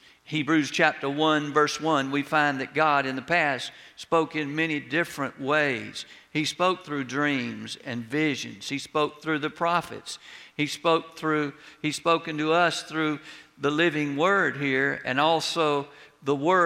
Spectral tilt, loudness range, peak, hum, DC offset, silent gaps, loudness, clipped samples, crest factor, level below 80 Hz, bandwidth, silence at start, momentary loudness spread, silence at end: -4.5 dB/octave; 4 LU; -4 dBFS; none; under 0.1%; none; -26 LUFS; under 0.1%; 22 dB; -70 dBFS; 15 kHz; 0.3 s; 11 LU; 0 s